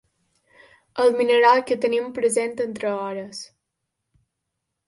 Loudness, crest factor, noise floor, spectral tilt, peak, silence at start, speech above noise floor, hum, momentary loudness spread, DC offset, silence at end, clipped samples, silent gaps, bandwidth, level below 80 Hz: -21 LUFS; 18 dB; -80 dBFS; -3 dB/octave; -4 dBFS; 0.95 s; 59 dB; none; 19 LU; under 0.1%; 1.4 s; under 0.1%; none; 11.5 kHz; -70 dBFS